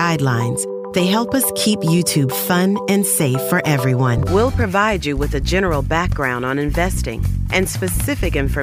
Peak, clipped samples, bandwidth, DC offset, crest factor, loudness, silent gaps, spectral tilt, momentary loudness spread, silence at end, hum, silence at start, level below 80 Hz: -2 dBFS; under 0.1%; 16 kHz; under 0.1%; 14 dB; -18 LUFS; none; -5 dB/octave; 5 LU; 0 s; none; 0 s; -28 dBFS